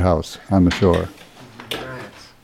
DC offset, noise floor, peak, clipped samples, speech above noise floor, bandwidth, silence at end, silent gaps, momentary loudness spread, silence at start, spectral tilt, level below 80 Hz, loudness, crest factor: under 0.1%; -41 dBFS; -2 dBFS; under 0.1%; 23 dB; 15.5 kHz; 0.2 s; none; 20 LU; 0 s; -6.5 dB/octave; -38 dBFS; -19 LUFS; 18 dB